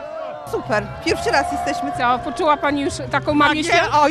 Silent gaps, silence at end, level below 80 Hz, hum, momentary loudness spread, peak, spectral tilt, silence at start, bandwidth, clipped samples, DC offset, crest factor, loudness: none; 0 s; -44 dBFS; none; 9 LU; -2 dBFS; -4 dB/octave; 0 s; 13.5 kHz; under 0.1%; under 0.1%; 16 dB; -19 LUFS